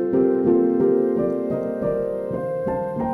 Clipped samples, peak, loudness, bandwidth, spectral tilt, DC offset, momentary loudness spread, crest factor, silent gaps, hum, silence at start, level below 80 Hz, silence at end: under 0.1%; -8 dBFS; -21 LUFS; 3.3 kHz; -10.5 dB/octave; under 0.1%; 7 LU; 14 dB; none; none; 0 s; -52 dBFS; 0 s